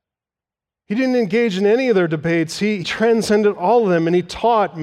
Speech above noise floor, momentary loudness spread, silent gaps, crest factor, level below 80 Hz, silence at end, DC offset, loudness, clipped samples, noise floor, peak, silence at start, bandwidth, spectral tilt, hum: 72 dB; 5 LU; none; 12 dB; -54 dBFS; 0 s; under 0.1%; -17 LUFS; under 0.1%; -89 dBFS; -4 dBFS; 0.9 s; 13.5 kHz; -6 dB/octave; none